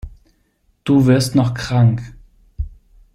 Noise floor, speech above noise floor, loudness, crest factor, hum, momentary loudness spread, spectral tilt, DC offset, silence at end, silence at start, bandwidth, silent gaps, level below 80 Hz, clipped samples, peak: -61 dBFS; 47 dB; -16 LUFS; 16 dB; none; 18 LU; -7 dB/octave; under 0.1%; 0.45 s; 0.05 s; 13 kHz; none; -36 dBFS; under 0.1%; -2 dBFS